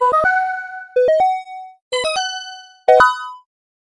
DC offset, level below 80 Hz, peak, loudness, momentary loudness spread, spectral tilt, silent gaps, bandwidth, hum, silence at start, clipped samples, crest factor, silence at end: under 0.1%; -54 dBFS; 0 dBFS; -17 LUFS; 20 LU; -1 dB/octave; 1.82-1.91 s; 11 kHz; none; 0 s; under 0.1%; 18 dB; 0.45 s